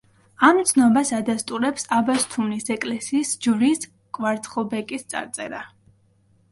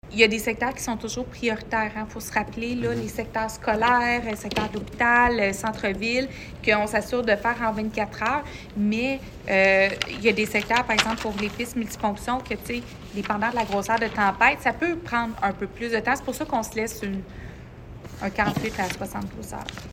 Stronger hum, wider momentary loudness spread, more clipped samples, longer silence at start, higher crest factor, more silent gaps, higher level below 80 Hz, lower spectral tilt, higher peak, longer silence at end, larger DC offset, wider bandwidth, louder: neither; about the same, 13 LU vs 13 LU; neither; first, 0.4 s vs 0.05 s; about the same, 20 dB vs 24 dB; neither; second, -64 dBFS vs -46 dBFS; about the same, -3.5 dB/octave vs -4 dB/octave; about the same, -2 dBFS vs -2 dBFS; first, 0.85 s vs 0 s; neither; second, 12 kHz vs 16 kHz; about the same, -22 LUFS vs -24 LUFS